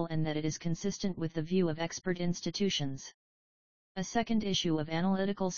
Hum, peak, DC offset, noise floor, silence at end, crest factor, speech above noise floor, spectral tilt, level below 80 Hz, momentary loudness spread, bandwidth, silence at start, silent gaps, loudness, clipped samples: none; -16 dBFS; 0.5%; under -90 dBFS; 0 s; 16 dB; over 57 dB; -5 dB/octave; -58 dBFS; 7 LU; 7.2 kHz; 0 s; 3.14-3.95 s; -33 LUFS; under 0.1%